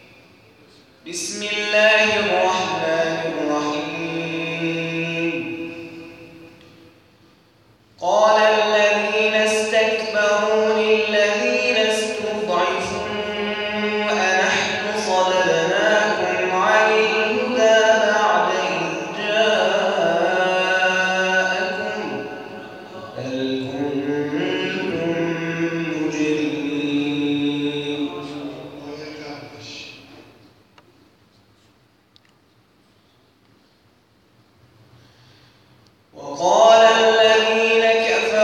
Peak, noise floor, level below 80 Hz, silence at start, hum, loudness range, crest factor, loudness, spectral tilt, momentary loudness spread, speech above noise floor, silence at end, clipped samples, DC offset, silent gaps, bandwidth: -2 dBFS; -57 dBFS; -64 dBFS; 1.05 s; none; 10 LU; 18 dB; -18 LUFS; -3.5 dB/octave; 17 LU; 39 dB; 0 s; under 0.1%; under 0.1%; none; 12 kHz